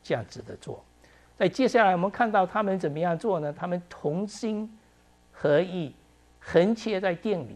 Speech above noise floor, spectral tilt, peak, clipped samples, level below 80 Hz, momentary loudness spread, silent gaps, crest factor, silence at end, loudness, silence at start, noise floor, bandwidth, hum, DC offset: 33 dB; -6.5 dB/octave; -8 dBFS; under 0.1%; -62 dBFS; 18 LU; none; 20 dB; 0 s; -26 LUFS; 0.05 s; -60 dBFS; 11.5 kHz; none; under 0.1%